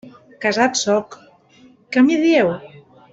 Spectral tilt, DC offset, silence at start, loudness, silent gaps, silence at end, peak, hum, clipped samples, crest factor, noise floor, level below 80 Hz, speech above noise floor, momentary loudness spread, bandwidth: -4 dB/octave; under 0.1%; 0.05 s; -17 LUFS; none; 0.45 s; -2 dBFS; none; under 0.1%; 16 dB; -50 dBFS; -62 dBFS; 34 dB; 10 LU; 8 kHz